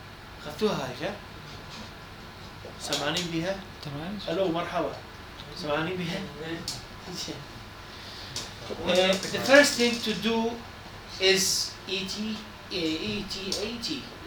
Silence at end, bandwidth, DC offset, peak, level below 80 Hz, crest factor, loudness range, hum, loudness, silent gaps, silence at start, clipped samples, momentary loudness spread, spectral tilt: 0 s; over 20 kHz; under 0.1%; -4 dBFS; -52 dBFS; 26 dB; 10 LU; none; -28 LUFS; none; 0 s; under 0.1%; 20 LU; -3 dB/octave